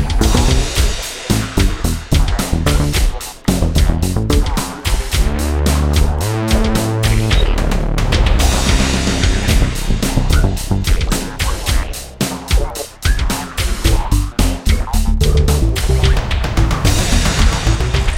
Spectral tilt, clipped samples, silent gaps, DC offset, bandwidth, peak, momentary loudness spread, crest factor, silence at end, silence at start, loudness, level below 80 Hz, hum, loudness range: -4.5 dB/octave; under 0.1%; none; under 0.1%; 16.5 kHz; 0 dBFS; 5 LU; 14 dB; 0 s; 0 s; -16 LUFS; -16 dBFS; none; 3 LU